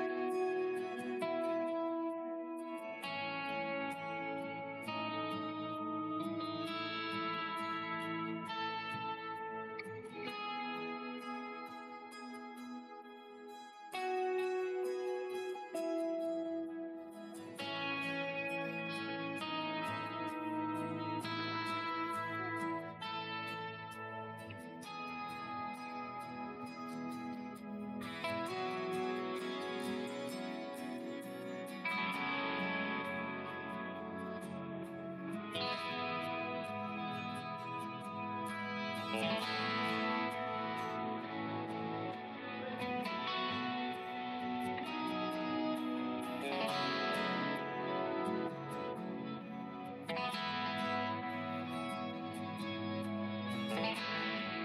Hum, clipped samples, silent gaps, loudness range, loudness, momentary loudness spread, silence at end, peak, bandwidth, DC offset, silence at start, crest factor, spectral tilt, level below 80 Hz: none; under 0.1%; none; 6 LU; -40 LUFS; 9 LU; 0 s; -24 dBFS; 15.5 kHz; under 0.1%; 0 s; 16 dB; -5 dB/octave; -84 dBFS